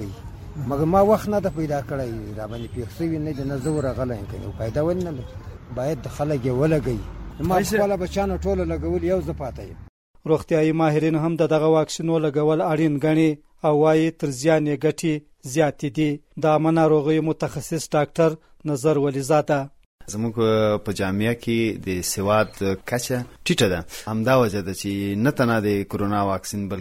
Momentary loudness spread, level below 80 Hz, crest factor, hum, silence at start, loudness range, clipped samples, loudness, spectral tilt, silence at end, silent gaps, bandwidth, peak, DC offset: 12 LU; -42 dBFS; 16 dB; none; 0 s; 6 LU; under 0.1%; -22 LUFS; -6 dB/octave; 0 s; 9.89-10.14 s, 19.86-19.98 s; 16.5 kHz; -6 dBFS; under 0.1%